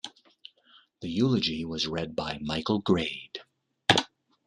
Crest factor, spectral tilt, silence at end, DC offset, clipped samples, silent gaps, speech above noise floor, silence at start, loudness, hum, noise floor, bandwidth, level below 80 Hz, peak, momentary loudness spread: 28 dB; -4.5 dB/octave; 0.4 s; under 0.1%; under 0.1%; none; 33 dB; 0.05 s; -28 LUFS; none; -61 dBFS; 12 kHz; -60 dBFS; -2 dBFS; 18 LU